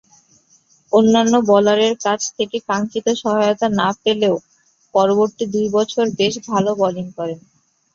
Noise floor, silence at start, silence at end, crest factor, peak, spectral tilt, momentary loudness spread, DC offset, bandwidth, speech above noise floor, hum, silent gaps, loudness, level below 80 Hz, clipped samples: -56 dBFS; 0.9 s; 0.55 s; 16 dB; -2 dBFS; -4.5 dB/octave; 9 LU; under 0.1%; 7.6 kHz; 39 dB; none; none; -17 LUFS; -60 dBFS; under 0.1%